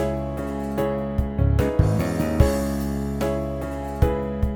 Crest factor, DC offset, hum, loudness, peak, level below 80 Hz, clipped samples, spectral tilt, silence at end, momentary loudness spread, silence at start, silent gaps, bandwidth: 20 dB; under 0.1%; none; -24 LUFS; -2 dBFS; -28 dBFS; under 0.1%; -7.5 dB/octave; 0 s; 8 LU; 0 s; none; 19 kHz